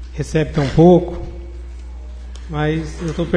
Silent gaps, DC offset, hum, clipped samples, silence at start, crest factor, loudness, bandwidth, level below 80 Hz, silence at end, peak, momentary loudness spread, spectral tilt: none; under 0.1%; none; under 0.1%; 0 s; 18 dB; -17 LUFS; 10.5 kHz; -30 dBFS; 0 s; 0 dBFS; 23 LU; -7.5 dB/octave